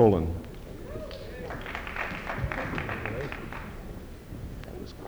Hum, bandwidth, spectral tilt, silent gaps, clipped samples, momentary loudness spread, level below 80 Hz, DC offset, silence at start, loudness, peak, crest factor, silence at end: none; over 20 kHz; -7 dB/octave; none; under 0.1%; 11 LU; -42 dBFS; under 0.1%; 0 s; -34 LUFS; -8 dBFS; 24 dB; 0 s